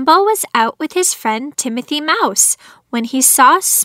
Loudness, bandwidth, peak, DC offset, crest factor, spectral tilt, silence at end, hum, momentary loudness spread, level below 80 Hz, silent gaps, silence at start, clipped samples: -13 LUFS; 16.5 kHz; 0 dBFS; under 0.1%; 14 dB; -0.5 dB/octave; 0 s; none; 11 LU; -66 dBFS; none; 0 s; under 0.1%